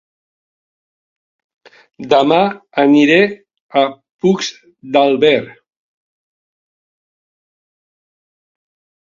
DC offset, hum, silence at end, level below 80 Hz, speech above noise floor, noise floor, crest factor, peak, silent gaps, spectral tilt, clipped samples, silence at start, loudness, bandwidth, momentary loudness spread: under 0.1%; none; 3.5 s; -62 dBFS; over 77 dB; under -90 dBFS; 18 dB; 0 dBFS; 3.61-3.69 s, 4.11-4.19 s; -5 dB/octave; under 0.1%; 2 s; -14 LUFS; 7.6 kHz; 9 LU